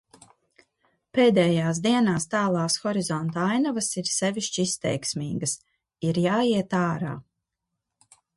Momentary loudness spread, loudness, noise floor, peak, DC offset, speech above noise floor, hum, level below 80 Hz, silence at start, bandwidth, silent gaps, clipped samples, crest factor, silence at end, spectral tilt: 8 LU; -25 LUFS; -83 dBFS; -8 dBFS; under 0.1%; 59 dB; none; -64 dBFS; 1.15 s; 11.5 kHz; none; under 0.1%; 18 dB; 1.15 s; -4.5 dB/octave